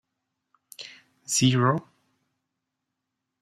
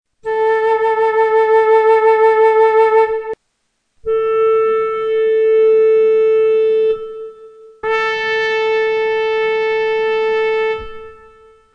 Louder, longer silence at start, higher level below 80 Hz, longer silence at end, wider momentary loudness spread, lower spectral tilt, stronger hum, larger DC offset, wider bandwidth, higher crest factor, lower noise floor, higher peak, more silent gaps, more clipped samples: second, -23 LUFS vs -14 LUFS; first, 0.8 s vs 0.25 s; second, -66 dBFS vs -50 dBFS; first, 1.6 s vs 0.6 s; first, 22 LU vs 12 LU; about the same, -4.5 dB/octave vs -3.5 dB/octave; neither; neither; first, 14 kHz vs 6 kHz; first, 22 dB vs 12 dB; first, -83 dBFS vs -68 dBFS; second, -8 dBFS vs -2 dBFS; neither; neither